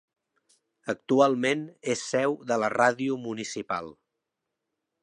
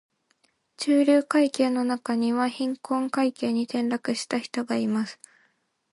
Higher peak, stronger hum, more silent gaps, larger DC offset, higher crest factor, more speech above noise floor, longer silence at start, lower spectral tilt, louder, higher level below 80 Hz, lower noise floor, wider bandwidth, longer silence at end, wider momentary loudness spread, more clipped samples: about the same, -8 dBFS vs -10 dBFS; neither; neither; neither; about the same, 20 dB vs 16 dB; first, 58 dB vs 45 dB; about the same, 0.85 s vs 0.8 s; about the same, -4.5 dB/octave vs -4.5 dB/octave; about the same, -27 LUFS vs -25 LUFS; about the same, -74 dBFS vs -78 dBFS; first, -84 dBFS vs -69 dBFS; about the same, 10.5 kHz vs 11.5 kHz; first, 1.1 s vs 0.8 s; first, 12 LU vs 8 LU; neither